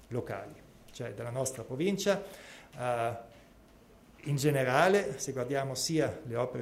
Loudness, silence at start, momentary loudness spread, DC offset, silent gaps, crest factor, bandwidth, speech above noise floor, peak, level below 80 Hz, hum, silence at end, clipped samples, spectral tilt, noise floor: -32 LUFS; 0 s; 19 LU; under 0.1%; none; 22 dB; 16 kHz; 26 dB; -12 dBFS; -64 dBFS; none; 0 s; under 0.1%; -5 dB/octave; -58 dBFS